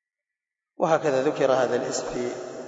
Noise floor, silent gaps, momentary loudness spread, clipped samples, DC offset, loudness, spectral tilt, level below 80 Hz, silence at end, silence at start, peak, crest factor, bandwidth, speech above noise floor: -88 dBFS; none; 8 LU; under 0.1%; under 0.1%; -24 LUFS; -4.5 dB/octave; -62 dBFS; 0 s; 0.8 s; -8 dBFS; 18 dB; 8 kHz; 65 dB